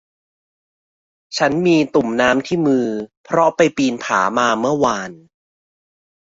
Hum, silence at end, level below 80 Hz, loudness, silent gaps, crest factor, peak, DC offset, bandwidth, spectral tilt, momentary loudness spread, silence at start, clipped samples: none; 1.15 s; -56 dBFS; -17 LUFS; 3.17-3.24 s; 18 dB; 0 dBFS; under 0.1%; 7.8 kHz; -5 dB/octave; 9 LU; 1.3 s; under 0.1%